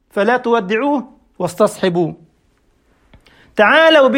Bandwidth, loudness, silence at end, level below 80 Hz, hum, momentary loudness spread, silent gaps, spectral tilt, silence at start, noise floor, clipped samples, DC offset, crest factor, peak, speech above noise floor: 16 kHz; -15 LUFS; 0 s; -58 dBFS; none; 15 LU; none; -5 dB/octave; 0.15 s; -58 dBFS; under 0.1%; under 0.1%; 16 dB; 0 dBFS; 45 dB